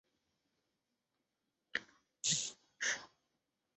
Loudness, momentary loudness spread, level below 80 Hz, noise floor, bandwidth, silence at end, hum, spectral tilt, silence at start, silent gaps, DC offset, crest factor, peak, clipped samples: -39 LUFS; 9 LU; -86 dBFS; -88 dBFS; 8.4 kHz; 0.7 s; none; 0.5 dB/octave; 1.75 s; none; under 0.1%; 26 dB; -20 dBFS; under 0.1%